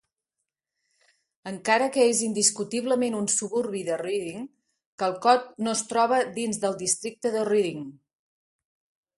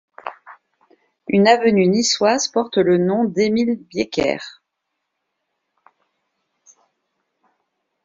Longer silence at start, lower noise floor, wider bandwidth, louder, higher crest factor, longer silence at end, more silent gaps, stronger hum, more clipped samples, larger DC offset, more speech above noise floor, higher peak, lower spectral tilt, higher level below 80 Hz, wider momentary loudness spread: first, 1.45 s vs 0.25 s; first, -85 dBFS vs -77 dBFS; first, 11.5 kHz vs 7.6 kHz; second, -25 LUFS vs -17 LUFS; about the same, 22 dB vs 20 dB; second, 1.25 s vs 3.55 s; first, 4.86-4.98 s vs none; neither; neither; neither; about the same, 60 dB vs 60 dB; second, -6 dBFS vs -2 dBFS; second, -2.5 dB/octave vs -4 dB/octave; second, -72 dBFS vs -60 dBFS; second, 13 LU vs 20 LU